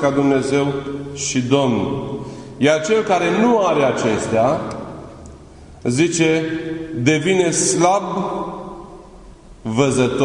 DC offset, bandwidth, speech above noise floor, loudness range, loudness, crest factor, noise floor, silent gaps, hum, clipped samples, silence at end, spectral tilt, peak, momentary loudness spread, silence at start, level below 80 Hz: under 0.1%; 11 kHz; 23 dB; 2 LU; -18 LUFS; 18 dB; -40 dBFS; none; none; under 0.1%; 0 s; -4.5 dB/octave; 0 dBFS; 15 LU; 0 s; -48 dBFS